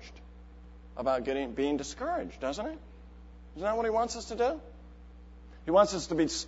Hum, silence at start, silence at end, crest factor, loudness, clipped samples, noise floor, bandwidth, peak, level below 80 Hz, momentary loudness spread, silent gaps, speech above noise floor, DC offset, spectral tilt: none; 0 s; 0 s; 22 dB; -31 LUFS; under 0.1%; -50 dBFS; 8 kHz; -10 dBFS; -50 dBFS; 26 LU; none; 20 dB; under 0.1%; -4.5 dB/octave